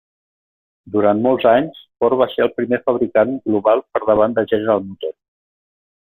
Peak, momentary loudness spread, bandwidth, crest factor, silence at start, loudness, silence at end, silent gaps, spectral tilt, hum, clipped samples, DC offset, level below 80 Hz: -2 dBFS; 7 LU; 13 kHz; 16 dB; 0.85 s; -17 LUFS; 0.95 s; none; -10 dB/octave; none; under 0.1%; under 0.1%; -56 dBFS